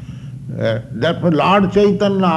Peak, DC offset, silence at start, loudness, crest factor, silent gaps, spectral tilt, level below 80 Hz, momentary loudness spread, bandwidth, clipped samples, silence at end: -2 dBFS; under 0.1%; 0 s; -15 LUFS; 14 dB; none; -7.5 dB/octave; -44 dBFS; 16 LU; 8.6 kHz; under 0.1%; 0 s